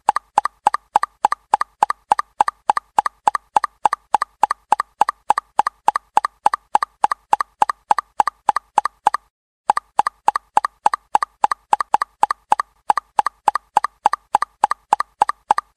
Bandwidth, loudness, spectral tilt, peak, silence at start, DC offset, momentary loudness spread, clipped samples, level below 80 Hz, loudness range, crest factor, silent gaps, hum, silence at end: 12.5 kHz; -20 LUFS; -1.5 dB/octave; 0 dBFS; 0.1 s; under 0.1%; 3 LU; under 0.1%; -60 dBFS; 1 LU; 20 dB; 9.30-9.64 s; none; 0.25 s